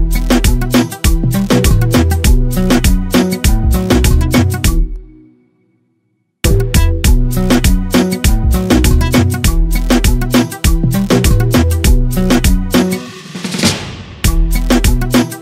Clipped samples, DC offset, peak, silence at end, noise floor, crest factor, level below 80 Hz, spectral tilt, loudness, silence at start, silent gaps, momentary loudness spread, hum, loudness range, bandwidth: under 0.1%; under 0.1%; 0 dBFS; 0 s; -63 dBFS; 10 dB; -14 dBFS; -5 dB/octave; -13 LUFS; 0 s; none; 5 LU; none; 3 LU; 16.5 kHz